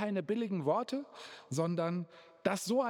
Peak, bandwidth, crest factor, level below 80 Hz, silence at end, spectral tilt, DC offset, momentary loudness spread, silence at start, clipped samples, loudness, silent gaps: -16 dBFS; 19 kHz; 20 dB; -88 dBFS; 0 s; -6 dB/octave; under 0.1%; 12 LU; 0 s; under 0.1%; -35 LUFS; none